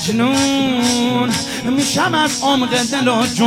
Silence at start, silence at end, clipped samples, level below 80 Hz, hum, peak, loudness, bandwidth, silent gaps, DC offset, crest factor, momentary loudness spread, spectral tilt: 0 s; 0 s; under 0.1%; -50 dBFS; none; -2 dBFS; -15 LUFS; 16.5 kHz; none; under 0.1%; 14 dB; 3 LU; -3.5 dB/octave